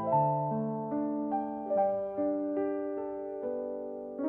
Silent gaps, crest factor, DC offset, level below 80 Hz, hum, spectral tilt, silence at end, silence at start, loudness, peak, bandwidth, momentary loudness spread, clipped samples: none; 16 dB; under 0.1%; -72 dBFS; none; -12.5 dB/octave; 0 s; 0 s; -33 LUFS; -16 dBFS; 3.2 kHz; 8 LU; under 0.1%